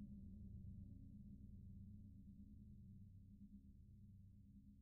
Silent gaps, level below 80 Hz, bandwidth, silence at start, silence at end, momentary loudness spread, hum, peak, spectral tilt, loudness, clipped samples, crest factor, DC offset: none; -66 dBFS; 0.8 kHz; 0 s; 0 s; 8 LU; none; -48 dBFS; -16.5 dB/octave; -62 LUFS; under 0.1%; 12 dB; under 0.1%